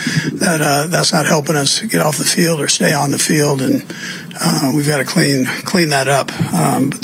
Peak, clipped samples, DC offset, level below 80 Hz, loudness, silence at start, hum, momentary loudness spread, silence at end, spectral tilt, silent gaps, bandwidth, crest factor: -2 dBFS; under 0.1%; under 0.1%; -54 dBFS; -14 LUFS; 0 s; none; 5 LU; 0 s; -4 dB/octave; none; 16.5 kHz; 14 dB